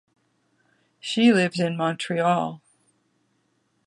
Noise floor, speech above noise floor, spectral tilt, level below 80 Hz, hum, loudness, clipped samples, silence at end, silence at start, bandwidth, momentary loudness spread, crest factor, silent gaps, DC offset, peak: -70 dBFS; 48 dB; -5.5 dB/octave; -72 dBFS; none; -22 LUFS; under 0.1%; 1.3 s; 1.05 s; 10.5 kHz; 15 LU; 20 dB; none; under 0.1%; -6 dBFS